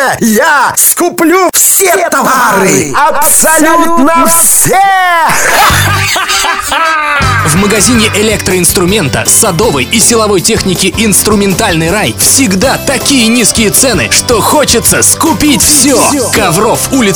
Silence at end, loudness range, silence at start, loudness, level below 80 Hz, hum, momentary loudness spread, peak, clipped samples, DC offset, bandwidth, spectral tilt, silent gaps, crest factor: 0 s; 2 LU; 0 s; -6 LUFS; -28 dBFS; none; 5 LU; 0 dBFS; 2%; under 0.1%; over 20 kHz; -2.5 dB/octave; none; 8 dB